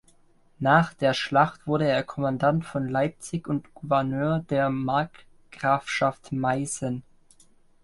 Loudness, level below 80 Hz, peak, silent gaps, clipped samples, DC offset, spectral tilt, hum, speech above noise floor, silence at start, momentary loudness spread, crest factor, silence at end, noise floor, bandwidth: -25 LUFS; -58 dBFS; -6 dBFS; none; under 0.1%; under 0.1%; -5.5 dB/octave; none; 34 dB; 0.6 s; 9 LU; 20 dB; 0.85 s; -59 dBFS; 11.5 kHz